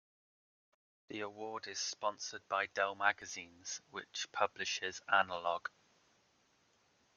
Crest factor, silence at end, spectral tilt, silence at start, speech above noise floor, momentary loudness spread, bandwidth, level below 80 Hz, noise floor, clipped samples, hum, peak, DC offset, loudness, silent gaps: 26 dB; 1.5 s; -1 dB/octave; 1.1 s; 35 dB; 12 LU; 10 kHz; -86 dBFS; -74 dBFS; under 0.1%; none; -14 dBFS; under 0.1%; -38 LUFS; none